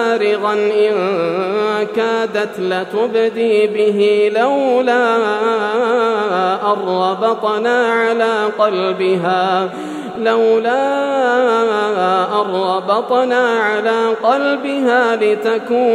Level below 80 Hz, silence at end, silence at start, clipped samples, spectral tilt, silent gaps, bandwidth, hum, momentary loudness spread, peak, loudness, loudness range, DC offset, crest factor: -74 dBFS; 0 s; 0 s; under 0.1%; -5 dB/octave; none; 10.5 kHz; none; 4 LU; 0 dBFS; -15 LUFS; 2 LU; under 0.1%; 14 dB